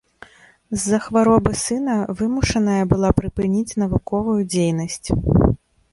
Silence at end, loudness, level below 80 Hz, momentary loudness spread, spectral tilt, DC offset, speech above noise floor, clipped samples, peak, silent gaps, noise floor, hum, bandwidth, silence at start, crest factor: 0.35 s; -20 LUFS; -34 dBFS; 6 LU; -6 dB/octave; under 0.1%; 28 dB; under 0.1%; -2 dBFS; none; -46 dBFS; none; 11.5 kHz; 0.7 s; 18 dB